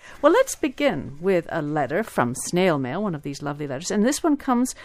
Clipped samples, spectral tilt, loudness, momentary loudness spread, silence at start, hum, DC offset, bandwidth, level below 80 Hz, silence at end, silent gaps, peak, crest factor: under 0.1%; -5 dB/octave; -23 LUFS; 9 LU; 0.05 s; none; under 0.1%; 15.5 kHz; -52 dBFS; 0 s; none; -4 dBFS; 20 dB